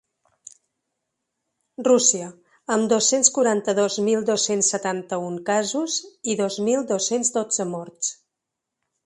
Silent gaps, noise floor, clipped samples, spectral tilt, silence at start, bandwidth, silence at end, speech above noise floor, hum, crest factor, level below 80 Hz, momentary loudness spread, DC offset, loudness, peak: none; -83 dBFS; under 0.1%; -2.5 dB/octave; 1.8 s; 11.5 kHz; 0.95 s; 61 dB; none; 22 dB; -72 dBFS; 11 LU; under 0.1%; -21 LUFS; -2 dBFS